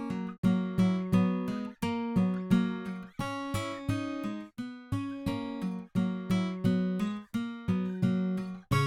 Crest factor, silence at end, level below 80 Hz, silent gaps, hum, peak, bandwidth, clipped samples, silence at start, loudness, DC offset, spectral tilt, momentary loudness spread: 18 dB; 0 s; -54 dBFS; 0.38-0.43 s; none; -12 dBFS; 13.5 kHz; under 0.1%; 0 s; -32 LUFS; under 0.1%; -7.5 dB/octave; 9 LU